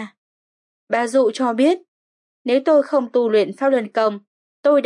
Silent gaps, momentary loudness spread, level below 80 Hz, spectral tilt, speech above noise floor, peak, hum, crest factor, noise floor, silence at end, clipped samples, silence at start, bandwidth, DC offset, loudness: 0.17-0.87 s, 1.88-2.45 s, 4.27-4.63 s; 9 LU; -86 dBFS; -5 dB/octave; over 73 dB; -6 dBFS; none; 14 dB; under -90 dBFS; 0 s; under 0.1%; 0 s; 11.5 kHz; under 0.1%; -19 LUFS